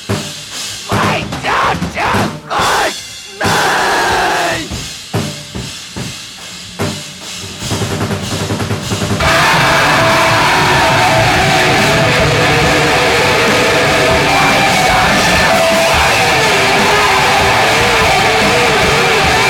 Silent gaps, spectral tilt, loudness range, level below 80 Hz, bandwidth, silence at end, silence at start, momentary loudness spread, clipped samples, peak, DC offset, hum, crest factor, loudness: none; -3.5 dB/octave; 10 LU; -32 dBFS; 18 kHz; 0 s; 0 s; 13 LU; under 0.1%; 0 dBFS; under 0.1%; none; 12 dB; -11 LUFS